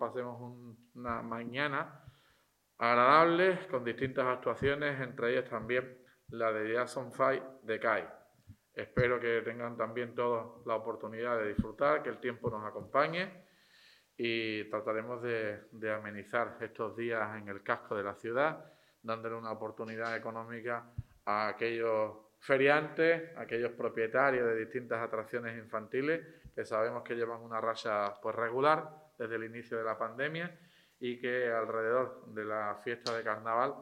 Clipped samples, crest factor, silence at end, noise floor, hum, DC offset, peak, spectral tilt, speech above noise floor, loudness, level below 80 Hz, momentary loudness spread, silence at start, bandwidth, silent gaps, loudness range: under 0.1%; 24 dB; 0 s; -72 dBFS; none; under 0.1%; -10 dBFS; -6 dB/octave; 38 dB; -34 LUFS; -64 dBFS; 12 LU; 0 s; 14.5 kHz; none; 7 LU